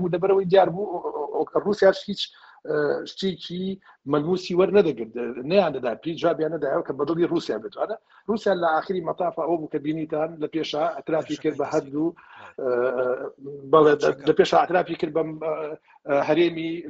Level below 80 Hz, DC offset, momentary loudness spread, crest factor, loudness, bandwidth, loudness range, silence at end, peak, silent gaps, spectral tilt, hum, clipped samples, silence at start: -64 dBFS; under 0.1%; 12 LU; 20 dB; -24 LUFS; 8 kHz; 5 LU; 0 s; -4 dBFS; none; -6.5 dB/octave; none; under 0.1%; 0 s